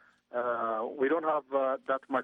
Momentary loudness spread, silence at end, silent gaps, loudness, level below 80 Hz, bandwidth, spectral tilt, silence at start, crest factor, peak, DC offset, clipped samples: 4 LU; 0 s; none; -31 LUFS; -80 dBFS; 4 kHz; -7 dB/octave; 0.35 s; 14 dB; -16 dBFS; under 0.1%; under 0.1%